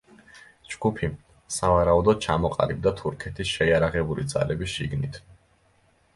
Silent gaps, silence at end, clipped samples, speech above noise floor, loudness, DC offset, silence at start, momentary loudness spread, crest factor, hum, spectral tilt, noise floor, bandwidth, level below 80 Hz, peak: none; 0.8 s; under 0.1%; 39 dB; -25 LUFS; under 0.1%; 0.35 s; 12 LU; 20 dB; none; -5.5 dB/octave; -63 dBFS; 12 kHz; -42 dBFS; -6 dBFS